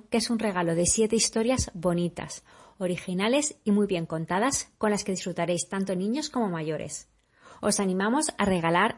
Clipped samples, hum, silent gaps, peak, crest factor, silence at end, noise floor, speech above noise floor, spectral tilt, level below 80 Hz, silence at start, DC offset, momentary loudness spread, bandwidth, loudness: under 0.1%; none; none; -8 dBFS; 18 dB; 0 s; -54 dBFS; 28 dB; -4 dB/octave; -52 dBFS; 0.1 s; under 0.1%; 9 LU; 11.5 kHz; -27 LUFS